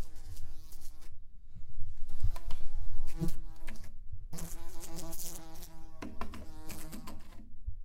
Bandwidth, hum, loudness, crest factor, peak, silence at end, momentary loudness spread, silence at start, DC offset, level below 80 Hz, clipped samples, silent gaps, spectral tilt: 15.5 kHz; none; -46 LUFS; 14 dB; -14 dBFS; 0 s; 13 LU; 0 s; under 0.1%; -38 dBFS; under 0.1%; none; -5 dB/octave